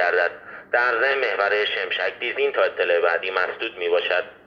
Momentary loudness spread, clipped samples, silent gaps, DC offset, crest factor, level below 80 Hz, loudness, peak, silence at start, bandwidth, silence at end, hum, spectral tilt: 5 LU; under 0.1%; none; under 0.1%; 16 dB; -70 dBFS; -22 LUFS; -6 dBFS; 0 s; 6.6 kHz; 0.1 s; none; -3.5 dB/octave